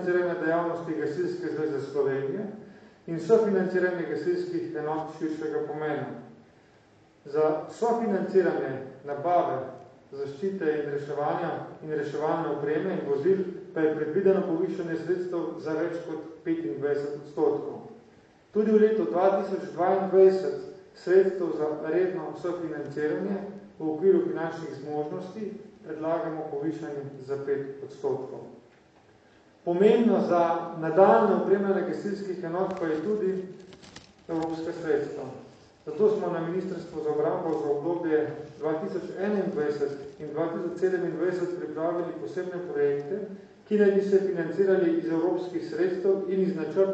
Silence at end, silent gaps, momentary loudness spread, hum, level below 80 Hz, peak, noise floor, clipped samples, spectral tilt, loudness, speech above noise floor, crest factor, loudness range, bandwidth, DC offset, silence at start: 0 s; none; 14 LU; none; -72 dBFS; -6 dBFS; -58 dBFS; under 0.1%; -8 dB/octave; -28 LUFS; 32 dB; 22 dB; 7 LU; 8 kHz; under 0.1%; 0 s